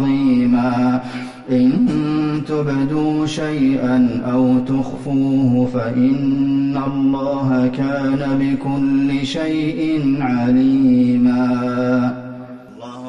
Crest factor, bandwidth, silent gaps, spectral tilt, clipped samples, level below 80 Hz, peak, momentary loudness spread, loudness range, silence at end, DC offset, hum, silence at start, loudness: 10 dB; 7.6 kHz; none; -8 dB/octave; under 0.1%; -46 dBFS; -6 dBFS; 6 LU; 2 LU; 0 s; under 0.1%; none; 0 s; -17 LUFS